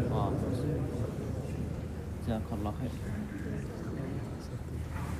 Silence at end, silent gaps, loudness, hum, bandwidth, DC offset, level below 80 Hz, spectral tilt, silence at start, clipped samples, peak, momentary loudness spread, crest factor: 0 s; none; -36 LUFS; none; 15.5 kHz; under 0.1%; -44 dBFS; -8 dB/octave; 0 s; under 0.1%; -18 dBFS; 7 LU; 16 dB